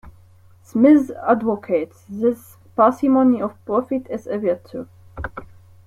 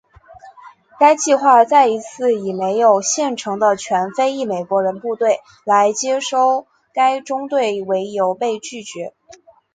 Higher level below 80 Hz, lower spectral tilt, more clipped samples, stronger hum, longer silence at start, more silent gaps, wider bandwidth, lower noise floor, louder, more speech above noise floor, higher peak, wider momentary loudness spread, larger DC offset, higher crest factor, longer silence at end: first, -48 dBFS vs -66 dBFS; first, -8 dB/octave vs -3 dB/octave; neither; neither; second, 0.05 s vs 0.3 s; neither; first, 14 kHz vs 9.6 kHz; first, -49 dBFS vs -43 dBFS; about the same, -19 LUFS vs -17 LUFS; first, 31 dB vs 27 dB; second, -4 dBFS vs 0 dBFS; first, 18 LU vs 10 LU; neither; about the same, 16 dB vs 18 dB; second, 0.4 s vs 0.65 s